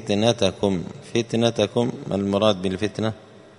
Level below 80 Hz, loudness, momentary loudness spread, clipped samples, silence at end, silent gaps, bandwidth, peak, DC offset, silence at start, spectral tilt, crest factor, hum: -56 dBFS; -23 LUFS; 8 LU; under 0.1%; 0.2 s; none; 11 kHz; -2 dBFS; under 0.1%; 0 s; -5.5 dB/octave; 20 dB; none